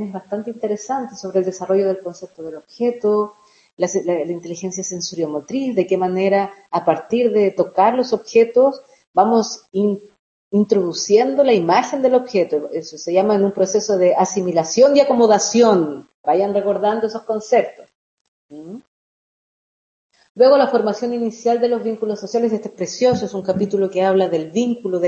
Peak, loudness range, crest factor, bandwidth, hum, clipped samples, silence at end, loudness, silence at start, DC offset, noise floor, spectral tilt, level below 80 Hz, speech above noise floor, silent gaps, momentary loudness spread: 0 dBFS; 7 LU; 18 dB; 8 kHz; none; under 0.1%; 0 s; -18 LUFS; 0 s; under 0.1%; under -90 dBFS; -5 dB/octave; -66 dBFS; over 73 dB; 3.73-3.77 s, 9.07-9.14 s, 10.19-10.51 s, 16.14-16.24 s, 17.95-18.49 s, 18.88-20.10 s, 20.30-20.35 s; 12 LU